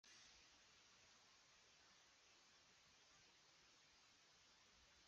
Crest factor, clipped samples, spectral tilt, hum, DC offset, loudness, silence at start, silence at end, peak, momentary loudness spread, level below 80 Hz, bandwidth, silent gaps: 18 dB; under 0.1%; 0 dB/octave; none; under 0.1%; -68 LUFS; 0.05 s; 0 s; -56 dBFS; 4 LU; under -90 dBFS; 7.6 kHz; none